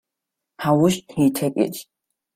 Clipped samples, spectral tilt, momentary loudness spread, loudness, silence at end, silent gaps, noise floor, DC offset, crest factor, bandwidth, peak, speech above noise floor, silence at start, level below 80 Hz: under 0.1%; -6 dB/octave; 8 LU; -21 LUFS; 0.55 s; none; -83 dBFS; under 0.1%; 16 dB; 16 kHz; -6 dBFS; 64 dB; 0.6 s; -60 dBFS